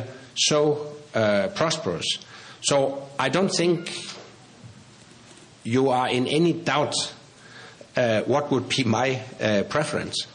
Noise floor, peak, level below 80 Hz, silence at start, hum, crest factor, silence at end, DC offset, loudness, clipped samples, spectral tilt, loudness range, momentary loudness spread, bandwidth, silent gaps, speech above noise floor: -49 dBFS; -6 dBFS; -64 dBFS; 0 s; none; 18 dB; 0 s; under 0.1%; -24 LUFS; under 0.1%; -4 dB/octave; 3 LU; 11 LU; 10.5 kHz; none; 26 dB